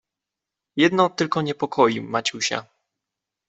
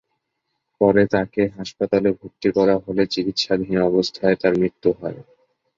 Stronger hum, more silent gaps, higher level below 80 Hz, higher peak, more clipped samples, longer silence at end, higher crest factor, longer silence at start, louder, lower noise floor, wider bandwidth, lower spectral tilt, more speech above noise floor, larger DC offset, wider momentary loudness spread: neither; neither; second, -66 dBFS vs -52 dBFS; about the same, -4 dBFS vs -2 dBFS; neither; first, 0.85 s vs 0.55 s; about the same, 20 dB vs 18 dB; about the same, 0.75 s vs 0.8 s; about the same, -22 LUFS vs -20 LUFS; first, -86 dBFS vs -76 dBFS; about the same, 8.2 kHz vs 7.6 kHz; second, -4 dB/octave vs -6 dB/octave; first, 65 dB vs 57 dB; neither; about the same, 7 LU vs 6 LU